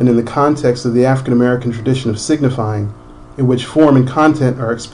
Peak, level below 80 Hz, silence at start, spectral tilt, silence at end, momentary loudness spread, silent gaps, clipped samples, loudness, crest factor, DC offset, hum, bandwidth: 0 dBFS; -42 dBFS; 0 s; -7 dB/octave; 0.05 s; 9 LU; none; under 0.1%; -14 LUFS; 12 dB; under 0.1%; none; 11 kHz